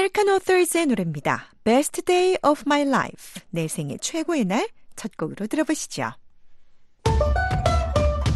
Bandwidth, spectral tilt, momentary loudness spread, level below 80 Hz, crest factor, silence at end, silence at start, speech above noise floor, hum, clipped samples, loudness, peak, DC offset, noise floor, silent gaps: 12.5 kHz; -5 dB/octave; 12 LU; -32 dBFS; 16 dB; 0 s; 0 s; 24 dB; none; under 0.1%; -23 LUFS; -6 dBFS; under 0.1%; -47 dBFS; none